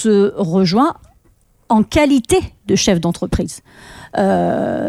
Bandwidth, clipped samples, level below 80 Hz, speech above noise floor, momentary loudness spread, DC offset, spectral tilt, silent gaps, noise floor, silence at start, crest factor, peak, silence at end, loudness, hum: 14.5 kHz; under 0.1%; -36 dBFS; 39 dB; 9 LU; under 0.1%; -5.5 dB/octave; none; -54 dBFS; 0 s; 14 dB; -2 dBFS; 0 s; -16 LUFS; none